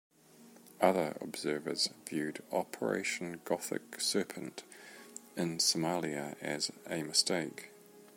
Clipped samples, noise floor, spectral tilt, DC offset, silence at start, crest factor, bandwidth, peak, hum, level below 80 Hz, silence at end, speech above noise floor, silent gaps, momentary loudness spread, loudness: under 0.1%; -59 dBFS; -3 dB/octave; under 0.1%; 0.4 s; 24 dB; 16.5 kHz; -12 dBFS; none; -80 dBFS; 0 s; 24 dB; none; 16 LU; -34 LUFS